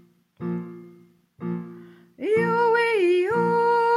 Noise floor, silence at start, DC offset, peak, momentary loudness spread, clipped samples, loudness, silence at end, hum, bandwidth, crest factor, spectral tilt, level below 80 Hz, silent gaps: -53 dBFS; 0.4 s; under 0.1%; -10 dBFS; 16 LU; under 0.1%; -23 LUFS; 0 s; none; 12 kHz; 14 dB; -7 dB/octave; -70 dBFS; none